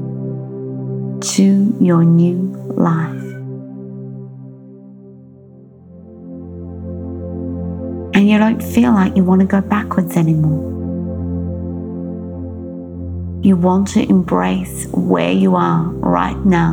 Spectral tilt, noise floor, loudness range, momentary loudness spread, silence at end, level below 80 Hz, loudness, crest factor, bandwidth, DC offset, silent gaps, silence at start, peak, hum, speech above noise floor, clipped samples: -7 dB/octave; -41 dBFS; 16 LU; 18 LU; 0 s; -40 dBFS; -16 LUFS; 16 dB; 16.5 kHz; under 0.1%; none; 0 s; 0 dBFS; none; 27 dB; under 0.1%